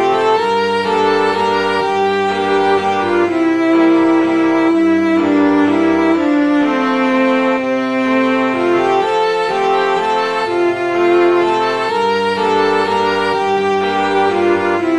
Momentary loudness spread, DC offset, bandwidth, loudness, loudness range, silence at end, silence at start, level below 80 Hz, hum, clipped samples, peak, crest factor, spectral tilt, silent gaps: 3 LU; 0.3%; 10.5 kHz; -14 LUFS; 2 LU; 0 s; 0 s; -56 dBFS; none; under 0.1%; -2 dBFS; 12 dB; -5.5 dB/octave; none